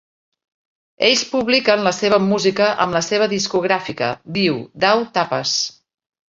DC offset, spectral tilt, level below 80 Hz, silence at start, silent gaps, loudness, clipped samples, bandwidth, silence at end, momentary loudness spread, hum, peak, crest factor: under 0.1%; -3.5 dB/octave; -58 dBFS; 1 s; none; -17 LUFS; under 0.1%; 7.8 kHz; 0.6 s; 5 LU; none; -2 dBFS; 18 dB